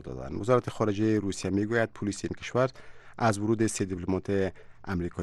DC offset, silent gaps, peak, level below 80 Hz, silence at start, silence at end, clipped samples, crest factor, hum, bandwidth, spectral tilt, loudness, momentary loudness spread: under 0.1%; none; -12 dBFS; -54 dBFS; 0 s; 0 s; under 0.1%; 18 dB; none; 12.5 kHz; -6 dB/octave; -29 LUFS; 8 LU